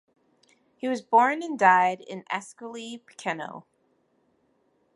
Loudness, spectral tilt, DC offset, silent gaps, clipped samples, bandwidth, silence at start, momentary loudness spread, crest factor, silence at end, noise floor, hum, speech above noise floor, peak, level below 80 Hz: -25 LUFS; -4.5 dB/octave; under 0.1%; none; under 0.1%; 11.5 kHz; 0.85 s; 20 LU; 22 dB; 1.35 s; -69 dBFS; none; 43 dB; -4 dBFS; -82 dBFS